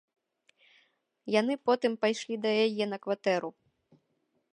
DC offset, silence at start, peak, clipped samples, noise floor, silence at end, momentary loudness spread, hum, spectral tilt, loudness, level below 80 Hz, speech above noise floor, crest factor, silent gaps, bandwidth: under 0.1%; 1.25 s; -12 dBFS; under 0.1%; -77 dBFS; 1.05 s; 6 LU; none; -4.5 dB/octave; -29 LUFS; -84 dBFS; 48 dB; 20 dB; none; 10.5 kHz